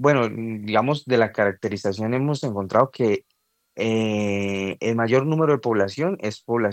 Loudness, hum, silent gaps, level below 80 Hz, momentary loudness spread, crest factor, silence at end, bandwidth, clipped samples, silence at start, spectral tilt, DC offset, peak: -23 LUFS; none; none; -70 dBFS; 6 LU; 18 dB; 0 s; 9 kHz; under 0.1%; 0 s; -6.5 dB/octave; under 0.1%; -4 dBFS